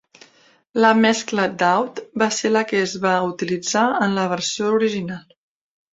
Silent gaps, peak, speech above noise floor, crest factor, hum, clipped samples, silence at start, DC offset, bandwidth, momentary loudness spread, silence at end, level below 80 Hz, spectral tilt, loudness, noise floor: none; -2 dBFS; 35 dB; 18 dB; none; under 0.1%; 0.75 s; under 0.1%; 7.8 kHz; 9 LU; 0.75 s; -64 dBFS; -4 dB/octave; -19 LUFS; -55 dBFS